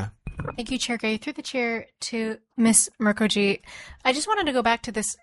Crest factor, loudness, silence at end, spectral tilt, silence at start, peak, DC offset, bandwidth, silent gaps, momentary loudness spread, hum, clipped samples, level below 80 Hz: 22 dB; -24 LUFS; 0.1 s; -3 dB/octave; 0 s; -4 dBFS; under 0.1%; 11.5 kHz; none; 13 LU; none; under 0.1%; -50 dBFS